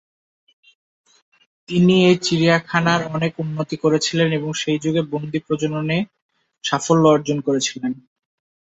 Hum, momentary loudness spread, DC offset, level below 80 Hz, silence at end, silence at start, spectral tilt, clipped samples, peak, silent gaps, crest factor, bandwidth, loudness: none; 11 LU; under 0.1%; -60 dBFS; 0.7 s; 1.7 s; -5 dB/octave; under 0.1%; -2 dBFS; 6.22-6.29 s; 18 dB; 8 kHz; -19 LUFS